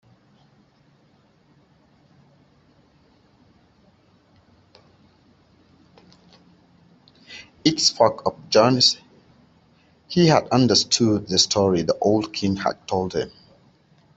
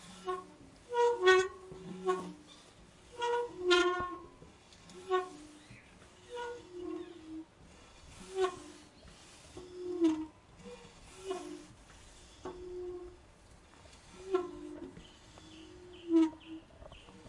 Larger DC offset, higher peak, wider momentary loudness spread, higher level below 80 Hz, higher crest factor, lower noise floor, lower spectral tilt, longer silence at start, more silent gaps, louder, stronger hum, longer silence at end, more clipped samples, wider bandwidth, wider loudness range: neither; first, -2 dBFS vs -12 dBFS; second, 12 LU vs 26 LU; about the same, -60 dBFS vs -64 dBFS; about the same, 22 dB vs 26 dB; about the same, -59 dBFS vs -59 dBFS; about the same, -4 dB/octave vs -4 dB/octave; first, 7.3 s vs 0 s; neither; first, -19 LUFS vs -34 LUFS; neither; first, 0.9 s vs 0 s; neither; second, 8.2 kHz vs 11.5 kHz; second, 6 LU vs 13 LU